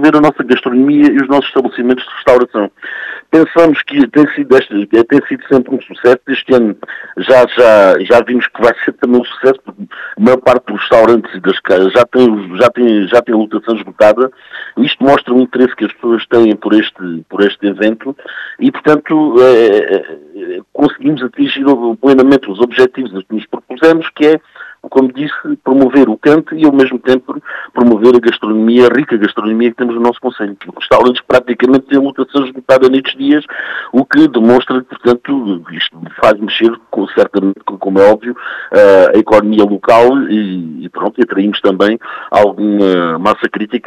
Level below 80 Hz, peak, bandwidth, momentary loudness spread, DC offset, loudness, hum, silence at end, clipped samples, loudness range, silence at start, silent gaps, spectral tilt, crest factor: -48 dBFS; 0 dBFS; 10.5 kHz; 12 LU; under 0.1%; -10 LUFS; none; 0.05 s; 2%; 3 LU; 0 s; none; -6.5 dB/octave; 10 dB